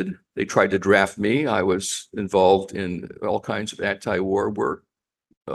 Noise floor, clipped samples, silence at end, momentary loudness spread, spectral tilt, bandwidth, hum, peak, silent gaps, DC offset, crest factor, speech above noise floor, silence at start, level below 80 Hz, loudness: -69 dBFS; under 0.1%; 0 s; 11 LU; -4.5 dB/octave; 12.5 kHz; none; -2 dBFS; 5.37-5.41 s; under 0.1%; 22 dB; 47 dB; 0 s; -56 dBFS; -22 LUFS